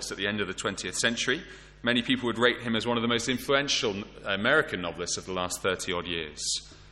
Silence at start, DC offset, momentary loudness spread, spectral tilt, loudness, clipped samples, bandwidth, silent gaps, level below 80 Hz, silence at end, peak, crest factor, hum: 0 s; under 0.1%; 8 LU; -3 dB/octave; -28 LUFS; under 0.1%; 16 kHz; none; -54 dBFS; 0 s; -8 dBFS; 22 dB; none